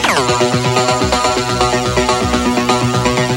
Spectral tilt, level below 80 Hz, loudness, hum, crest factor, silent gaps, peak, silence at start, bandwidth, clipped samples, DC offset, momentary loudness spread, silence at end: -4 dB/octave; -30 dBFS; -14 LUFS; none; 14 dB; none; 0 dBFS; 0 s; 16.5 kHz; under 0.1%; under 0.1%; 1 LU; 0 s